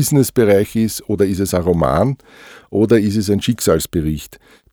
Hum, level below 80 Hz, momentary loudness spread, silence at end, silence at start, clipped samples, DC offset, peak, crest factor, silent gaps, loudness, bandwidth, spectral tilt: none; -38 dBFS; 10 LU; 0.4 s; 0 s; under 0.1%; under 0.1%; -2 dBFS; 14 dB; none; -16 LUFS; over 20 kHz; -6 dB/octave